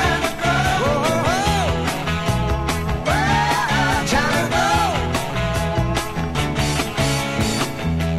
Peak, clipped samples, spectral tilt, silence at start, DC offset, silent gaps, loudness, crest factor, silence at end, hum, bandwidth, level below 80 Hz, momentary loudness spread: -4 dBFS; under 0.1%; -4.5 dB/octave; 0 s; 0.5%; none; -19 LUFS; 16 dB; 0 s; none; 15.5 kHz; -30 dBFS; 4 LU